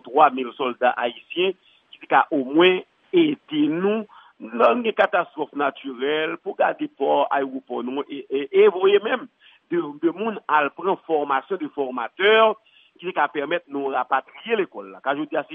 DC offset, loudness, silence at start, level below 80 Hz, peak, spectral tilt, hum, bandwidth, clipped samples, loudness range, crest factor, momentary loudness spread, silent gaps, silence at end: under 0.1%; -22 LUFS; 0.05 s; -82 dBFS; -2 dBFS; -7.5 dB/octave; none; 3.9 kHz; under 0.1%; 3 LU; 20 dB; 11 LU; none; 0 s